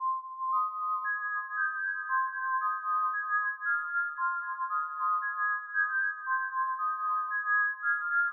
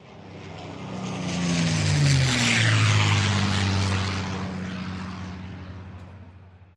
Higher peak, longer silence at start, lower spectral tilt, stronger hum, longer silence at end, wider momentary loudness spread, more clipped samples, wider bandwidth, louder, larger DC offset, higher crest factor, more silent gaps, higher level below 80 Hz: second, -18 dBFS vs -8 dBFS; about the same, 0 s vs 0.05 s; second, 21.5 dB/octave vs -4.5 dB/octave; neither; about the same, 0 s vs 0.1 s; second, 4 LU vs 21 LU; neither; second, 1.8 kHz vs 11.5 kHz; second, -30 LUFS vs -23 LUFS; neither; about the same, 12 dB vs 16 dB; neither; second, under -90 dBFS vs -48 dBFS